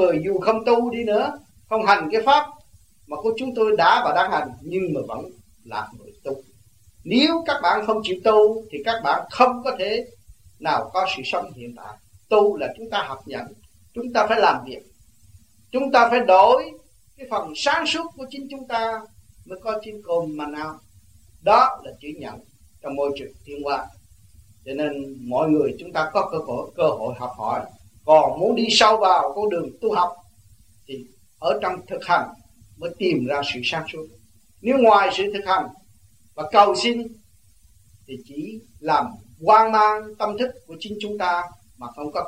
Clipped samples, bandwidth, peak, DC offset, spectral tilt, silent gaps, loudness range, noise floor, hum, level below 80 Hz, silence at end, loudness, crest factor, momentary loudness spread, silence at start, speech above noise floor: under 0.1%; 15.5 kHz; -2 dBFS; 0.1%; -4 dB/octave; none; 7 LU; -56 dBFS; none; -58 dBFS; 0 s; -21 LUFS; 20 dB; 20 LU; 0 s; 35 dB